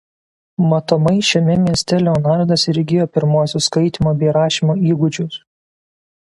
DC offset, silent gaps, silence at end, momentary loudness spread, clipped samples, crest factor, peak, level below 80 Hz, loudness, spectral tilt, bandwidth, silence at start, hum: under 0.1%; none; 0.85 s; 5 LU; under 0.1%; 16 dB; 0 dBFS; -46 dBFS; -15 LUFS; -6 dB/octave; 11.5 kHz; 0.6 s; none